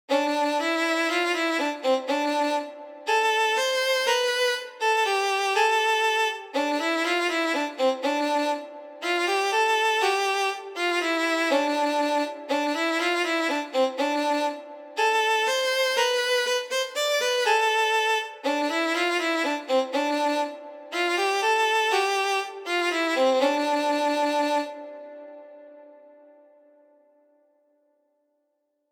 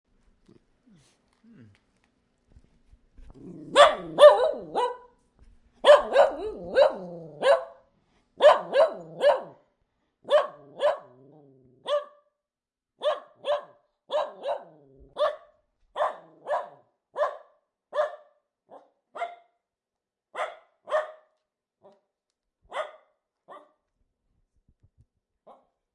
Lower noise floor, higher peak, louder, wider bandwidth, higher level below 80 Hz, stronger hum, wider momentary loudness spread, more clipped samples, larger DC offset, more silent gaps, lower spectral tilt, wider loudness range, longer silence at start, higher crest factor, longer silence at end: second, -75 dBFS vs under -90 dBFS; second, -10 dBFS vs -2 dBFS; about the same, -24 LUFS vs -24 LUFS; first, over 20 kHz vs 11.5 kHz; second, under -90 dBFS vs -64 dBFS; neither; second, 7 LU vs 23 LU; neither; neither; neither; second, 0.5 dB/octave vs -3 dB/octave; second, 2 LU vs 17 LU; second, 0.1 s vs 3.3 s; second, 16 dB vs 26 dB; about the same, 3.05 s vs 3.05 s